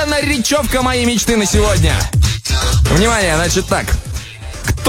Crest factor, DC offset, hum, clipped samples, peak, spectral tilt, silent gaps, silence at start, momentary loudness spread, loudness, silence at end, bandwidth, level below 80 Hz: 14 dB; under 0.1%; none; under 0.1%; 0 dBFS; -4 dB/octave; none; 0 s; 9 LU; -14 LUFS; 0 s; 16.5 kHz; -20 dBFS